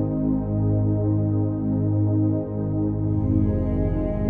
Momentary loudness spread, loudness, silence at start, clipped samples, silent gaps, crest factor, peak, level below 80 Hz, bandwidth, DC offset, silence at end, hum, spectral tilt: 3 LU; -23 LUFS; 0 s; under 0.1%; none; 14 dB; -8 dBFS; -34 dBFS; 2.4 kHz; under 0.1%; 0 s; 50 Hz at -50 dBFS; -14 dB/octave